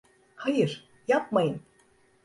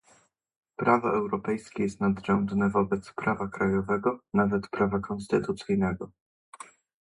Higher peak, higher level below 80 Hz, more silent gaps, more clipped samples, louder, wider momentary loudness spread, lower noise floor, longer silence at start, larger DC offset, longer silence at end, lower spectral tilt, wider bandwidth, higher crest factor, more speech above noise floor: second, -12 dBFS vs -6 dBFS; second, -70 dBFS vs -54 dBFS; second, none vs 6.21-6.52 s; neither; about the same, -28 LUFS vs -28 LUFS; about the same, 12 LU vs 13 LU; about the same, -63 dBFS vs -64 dBFS; second, 0.4 s vs 0.8 s; neither; first, 0.65 s vs 0.4 s; about the same, -6.5 dB/octave vs -7.5 dB/octave; about the same, 11.5 kHz vs 11.5 kHz; about the same, 18 dB vs 22 dB; about the same, 37 dB vs 36 dB